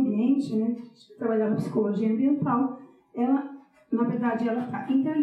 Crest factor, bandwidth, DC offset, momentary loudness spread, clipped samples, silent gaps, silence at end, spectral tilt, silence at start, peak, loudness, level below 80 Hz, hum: 12 dB; 8.6 kHz; under 0.1%; 8 LU; under 0.1%; none; 0 s; -9 dB/octave; 0 s; -12 dBFS; -26 LUFS; -78 dBFS; none